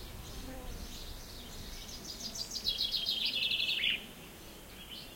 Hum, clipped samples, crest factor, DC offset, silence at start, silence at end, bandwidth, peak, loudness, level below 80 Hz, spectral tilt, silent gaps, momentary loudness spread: none; under 0.1%; 20 dB; under 0.1%; 0 s; 0 s; 16.5 kHz; -20 dBFS; -33 LUFS; -50 dBFS; -1.5 dB/octave; none; 18 LU